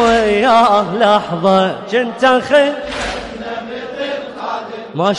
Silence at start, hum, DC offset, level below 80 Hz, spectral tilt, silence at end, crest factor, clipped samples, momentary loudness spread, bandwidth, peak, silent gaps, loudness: 0 s; none; under 0.1%; -42 dBFS; -5 dB/octave; 0 s; 14 dB; under 0.1%; 14 LU; 11.5 kHz; -2 dBFS; none; -14 LUFS